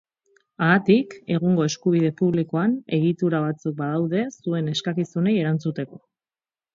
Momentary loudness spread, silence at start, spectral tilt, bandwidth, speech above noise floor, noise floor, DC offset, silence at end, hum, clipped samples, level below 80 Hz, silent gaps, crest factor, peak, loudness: 7 LU; 0.6 s; -6.5 dB/octave; 7.6 kHz; over 68 dB; under -90 dBFS; under 0.1%; 0.8 s; none; under 0.1%; -64 dBFS; none; 18 dB; -4 dBFS; -23 LUFS